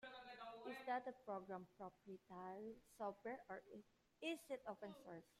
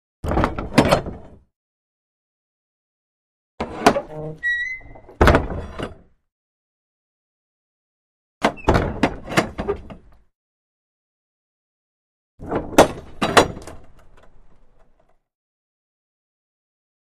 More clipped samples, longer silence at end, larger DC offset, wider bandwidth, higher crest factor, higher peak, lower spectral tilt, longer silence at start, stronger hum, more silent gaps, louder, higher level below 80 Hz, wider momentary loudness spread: neither; second, 0.1 s vs 2.55 s; neither; about the same, 15 kHz vs 15 kHz; about the same, 20 dB vs 24 dB; second, -34 dBFS vs 0 dBFS; about the same, -5 dB/octave vs -5 dB/octave; second, 0 s vs 0.25 s; neither; second, none vs 1.56-3.58 s, 6.32-8.41 s, 10.35-12.38 s; second, -53 LUFS vs -20 LUFS; second, -86 dBFS vs -36 dBFS; second, 11 LU vs 17 LU